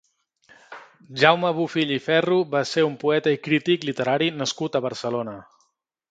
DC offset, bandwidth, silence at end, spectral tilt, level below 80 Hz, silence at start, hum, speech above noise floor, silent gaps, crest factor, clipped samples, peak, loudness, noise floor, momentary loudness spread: under 0.1%; 9.2 kHz; 0.7 s; -5 dB/octave; -68 dBFS; 0.7 s; none; 47 dB; none; 24 dB; under 0.1%; 0 dBFS; -22 LUFS; -69 dBFS; 10 LU